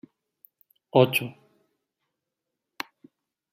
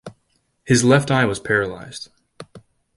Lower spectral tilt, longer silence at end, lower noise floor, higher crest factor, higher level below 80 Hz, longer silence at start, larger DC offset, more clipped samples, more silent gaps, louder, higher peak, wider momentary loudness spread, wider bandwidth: about the same, -5.5 dB/octave vs -5 dB/octave; first, 2.2 s vs 0.4 s; first, -85 dBFS vs -67 dBFS; first, 26 dB vs 20 dB; second, -76 dBFS vs -50 dBFS; first, 0.95 s vs 0.05 s; neither; neither; neither; second, -23 LUFS vs -18 LUFS; about the same, -4 dBFS vs -2 dBFS; about the same, 18 LU vs 20 LU; first, 16 kHz vs 11.5 kHz